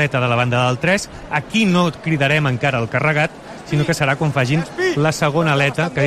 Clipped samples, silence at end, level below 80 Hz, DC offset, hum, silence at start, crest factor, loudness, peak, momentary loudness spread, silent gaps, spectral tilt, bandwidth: under 0.1%; 0 s; -46 dBFS; under 0.1%; none; 0 s; 14 dB; -17 LUFS; -4 dBFS; 4 LU; none; -5.5 dB/octave; 14 kHz